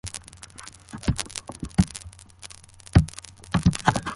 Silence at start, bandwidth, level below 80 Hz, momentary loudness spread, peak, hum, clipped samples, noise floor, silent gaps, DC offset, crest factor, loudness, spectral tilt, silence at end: 0.05 s; 11.5 kHz; -36 dBFS; 21 LU; -2 dBFS; none; under 0.1%; -46 dBFS; none; under 0.1%; 24 dB; -25 LUFS; -5.5 dB/octave; 0 s